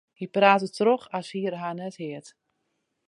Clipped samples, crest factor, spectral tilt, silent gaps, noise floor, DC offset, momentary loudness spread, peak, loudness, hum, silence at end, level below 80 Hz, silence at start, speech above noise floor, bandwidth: under 0.1%; 24 dB; -5.5 dB/octave; none; -77 dBFS; under 0.1%; 17 LU; -4 dBFS; -25 LUFS; none; 0.8 s; -80 dBFS; 0.2 s; 52 dB; 11.5 kHz